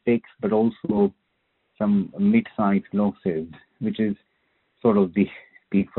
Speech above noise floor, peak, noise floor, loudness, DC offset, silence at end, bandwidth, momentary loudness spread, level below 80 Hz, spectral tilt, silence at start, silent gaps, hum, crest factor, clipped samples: 50 dB; -6 dBFS; -72 dBFS; -23 LUFS; under 0.1%; 0.1 s; 4.1 kHz; 8 LU; -60 dBFS; -8 dB/octave; 0.05 s; none; none; 16 dB; under 0.1%